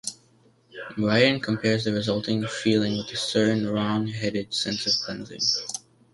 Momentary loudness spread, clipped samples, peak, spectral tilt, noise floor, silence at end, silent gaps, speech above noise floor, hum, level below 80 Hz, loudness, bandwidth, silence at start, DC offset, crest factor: 11 LU; under 0.1%; -6 dBFS; -4.5 dB/octave; -60 dBFS; 0.35 s; none; 35 dB; none; -60 dBFS; -24 LUFS; 11.5 kHz; 0.05 s; under 0.1%; 20 dB